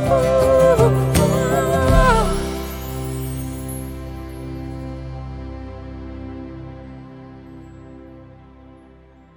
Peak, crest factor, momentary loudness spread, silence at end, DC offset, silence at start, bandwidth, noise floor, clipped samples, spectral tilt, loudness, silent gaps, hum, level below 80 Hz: -2 dBFS; 18 dB; 25 LU; 0.95 s; under 0.1%; 0 s; over 20 kHz; -47 dBFS; under 0.1%; -6 dB/octave; -18 LUFS; none; none; -30 dBFS